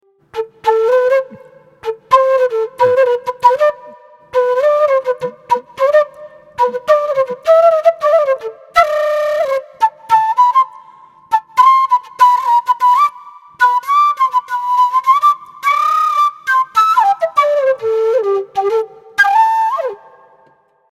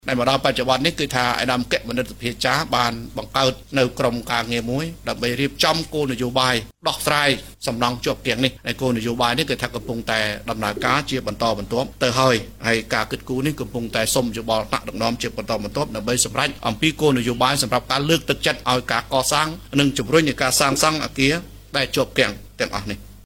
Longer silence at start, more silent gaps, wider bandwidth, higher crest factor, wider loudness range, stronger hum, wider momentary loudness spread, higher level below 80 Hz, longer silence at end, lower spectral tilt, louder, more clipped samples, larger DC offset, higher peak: first, 0.35 s vs 0.05 s; neither; second, 15 kHz vs 17 kHz; second, 14 dB vs 20 dB; about the same, 2 LU vs 3 LU; neither; about the same, 8 LU vs 7 LU; second, -60 dBFS vs -42 dBFS; first, 1.05 s vs 0.05 s; about the same, -2.5 dB/octave vs -3.5 dB/octave; first, -13 LUFS vs -21 LUFS; neither; neither; about the same, 0 dBFS vs -2 dBFS